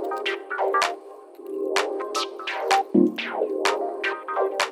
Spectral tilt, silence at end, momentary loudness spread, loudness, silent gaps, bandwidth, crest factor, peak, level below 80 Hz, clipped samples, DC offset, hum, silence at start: -3.5 dB/octave; 0 s; 9 LU; -25 LUFS; none; 16.5 kHz; 20 dB; -6 dBFS; -80 dBFS; under 0.1%; under 0.1%; none; 0 s